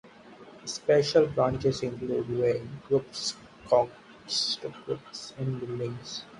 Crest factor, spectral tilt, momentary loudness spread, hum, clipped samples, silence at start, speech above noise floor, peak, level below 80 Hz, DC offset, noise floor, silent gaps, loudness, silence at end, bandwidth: 20 dB; -4.5 dB/octave; 13 LU; none; under 0.1%; 0.05 s; 22 dB; -10 dBFS; -58 dBFS; under 0.1%; -50 dBFS; none; -29 LUFS; 0 s; 11.5 kHz